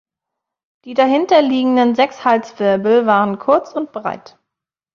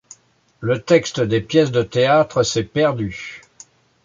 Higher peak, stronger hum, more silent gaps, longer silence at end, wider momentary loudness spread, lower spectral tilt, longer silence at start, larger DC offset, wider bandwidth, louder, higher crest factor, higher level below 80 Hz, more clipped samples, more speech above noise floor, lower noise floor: about the same, 0 dBFS vs -2 dBFS; neither; neither; about the same, 0.75 s vs 0.65 s; about the same, 12 LU vs 13 LU; about the same, -6 dB/octave vs -5 dB/octave; first, 0.85 s vs 0.6 s; neither; second, 7 kHz vs 7.8 kHz; first, -15 LUFS vs -18 LUFS; about the same, 16 dB vs 16 dB; second, -62 dBFS vs -50 dBFS; neither; first, 68 dB vs 30 dB; first, -83 dBFS vs -48 dBFS